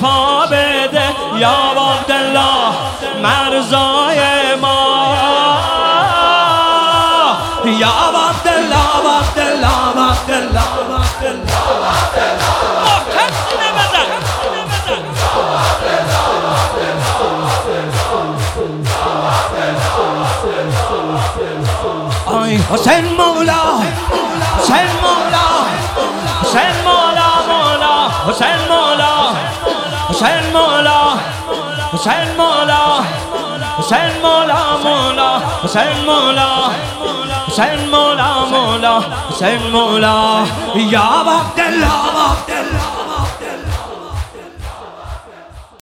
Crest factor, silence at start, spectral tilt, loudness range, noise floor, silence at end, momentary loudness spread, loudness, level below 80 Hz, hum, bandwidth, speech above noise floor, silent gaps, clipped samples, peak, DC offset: 12 dB; 0 s; -4 dB/octave; 5 LU; -35 dBFS; 0.2 s; 8 LU; -13 LUFS; -30 dBFS; none; 17.5 kHz; 23 dB; none; under 0.1%; 0 dBFS; under 0.1%